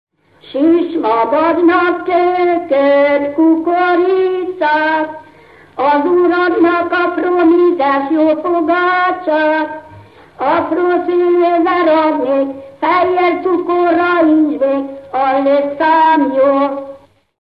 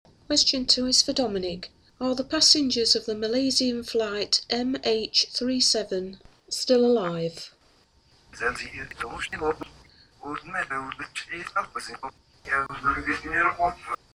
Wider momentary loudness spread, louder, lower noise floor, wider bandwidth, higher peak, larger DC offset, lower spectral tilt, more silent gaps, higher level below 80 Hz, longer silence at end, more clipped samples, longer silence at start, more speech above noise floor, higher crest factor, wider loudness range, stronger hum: second, 7 LU vs 16 LU; first, -13 LUFS vs -24 LUFS; second, -42 dBFS vs -61 dBFS; second, 5.4 kHz vs 15.5 kHz; first, -2 dBFS vs -6 dBFS; first, 0.1% vs under 0.1%; first, -7 dB/octave vs -2 dB/octave; neither; about the same, -56 dBFS vs -52 dBFS; first, 0.45 s vs 0.2 s; neither; first, 0.5 s vs 0.3 s; second, 30 dB vs 35 dB; second, 12 dB vs 20 dB; second, 2 LU vs 11 LU; neither